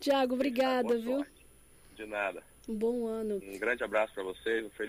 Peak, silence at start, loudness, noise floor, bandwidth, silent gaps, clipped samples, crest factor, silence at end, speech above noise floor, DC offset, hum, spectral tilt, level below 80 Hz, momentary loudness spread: -18 dBFS; 0 s; -33 LUFS; -58 dBFS; 15.5 kHz; none; under 0.1%; 16 dB; 0 s; 26 dB; under 0.1%; none; -4.5 dB/octave; -62 dBFS; 11 LU